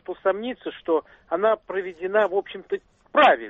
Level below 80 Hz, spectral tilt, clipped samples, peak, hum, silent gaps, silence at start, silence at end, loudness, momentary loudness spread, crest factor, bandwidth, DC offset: -64 dBFS; -5.5 dB/octave; under 0.1%; -6 dBFS; none; none; 0.1 s; 0 s; -24 LUFS; 12 LU; 18 dB; 7.4 kHz; under 0.1%